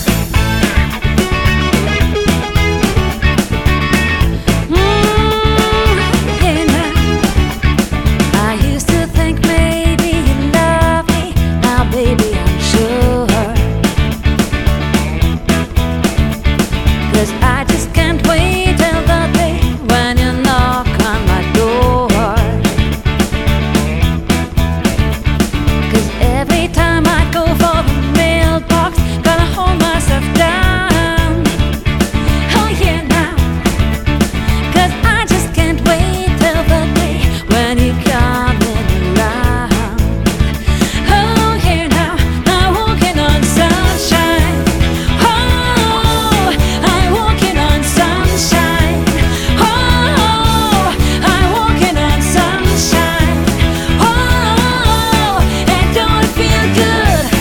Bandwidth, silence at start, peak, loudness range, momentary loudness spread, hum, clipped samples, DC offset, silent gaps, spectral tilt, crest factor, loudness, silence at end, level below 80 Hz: 18.5 kHz; 0 s; 0 dBFS; 2 LU; 3 LU; none; under 0.1%; 0.2%; none; -5 dB/octave; 12 dB; -12 LUFS; 0 s; -18 dBFS